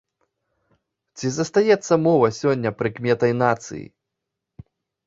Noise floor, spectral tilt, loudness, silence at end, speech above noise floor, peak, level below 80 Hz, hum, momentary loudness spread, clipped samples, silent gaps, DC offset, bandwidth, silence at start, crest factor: -82 dBFS; -6 dB/octave; -20 LUFS; 1.2 s; 62 dB; -2 dBFS; -60 dBFS; none; 10 LU; under 0.1%; none; under 0.1%; 7.8 kHz; 1.15 s; 20 dB